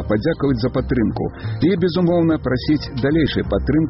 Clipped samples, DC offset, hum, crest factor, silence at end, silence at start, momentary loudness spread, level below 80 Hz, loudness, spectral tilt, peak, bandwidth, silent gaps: under 0.1%; under 0.1%; none; 12 dB; 0 s; 0 s; 4 LU; -32 dBFS; -19 LUFS; -6.5 dB/octave; -6 dBFS; 5.8 kHz; none